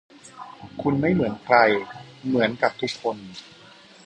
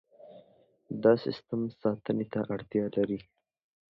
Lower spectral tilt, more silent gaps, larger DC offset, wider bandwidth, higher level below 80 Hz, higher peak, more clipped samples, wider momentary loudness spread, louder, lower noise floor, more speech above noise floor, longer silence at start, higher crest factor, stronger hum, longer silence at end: second, -6 dB/octave vs -9.5 dB/octave; neither; neither; first, 10 kHz vs 5.8 kHz; first, -58 dBFS vs -68 dBFS; first, -2 dBFS vs -10 dBFS; neither; first, 23 LU vs 9 LU; first, -22 LUFS vs -31 LUFS; second, -43 dBFS vs -64 dBFS; second, 20 dB vs 34 dB; about the same, 0.25 s vs 0.25 s; about the same, 22 dB vs 22 dB; neither; about the same, 0.65 s vs 0.7 s